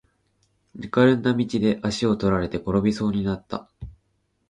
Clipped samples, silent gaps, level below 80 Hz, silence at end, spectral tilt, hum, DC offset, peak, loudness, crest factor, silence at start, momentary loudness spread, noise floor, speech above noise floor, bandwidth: under 0.1%; none; -46 dBFS; 0.6 s; -7 dB/octave; none; under 0.1%; -6 dBFS; -23 LUFS; 18 dB; 0.75 s; 19 LU; -70 dBFS; 48 dB; 10.5 kHz